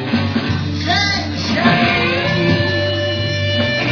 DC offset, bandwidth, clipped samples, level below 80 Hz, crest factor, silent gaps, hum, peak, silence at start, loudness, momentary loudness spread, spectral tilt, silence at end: under 0.1%; 5.4 kHz; under 0.1%; -42 dBFS; 16 dB; none; none; 0 dBFS; 0 s; -16 LUFS; 5 LU; -5.5 dB/octave; 0 s